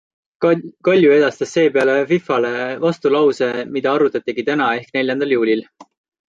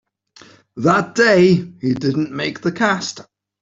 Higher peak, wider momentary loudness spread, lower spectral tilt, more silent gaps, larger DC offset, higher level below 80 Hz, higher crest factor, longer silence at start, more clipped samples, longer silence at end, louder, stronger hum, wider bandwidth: about the same, -2 dBFS vs -2 dBFS; second, 7 LU vs 12 LU; about the same, -6 dB/octave vs -5.5 dB/octave; neither; neither; second, -66 dBFS vs -56 dBFS; about the same, 14 dB vs 16 dB; second, 0.4 s vs 0.75 s; neither; about the same, 0.5 s vs 0.4 s; about the same, -17 LUFS vs -17 LUFS; neither; about the same, 7.8 kHz vs 7.8 kHz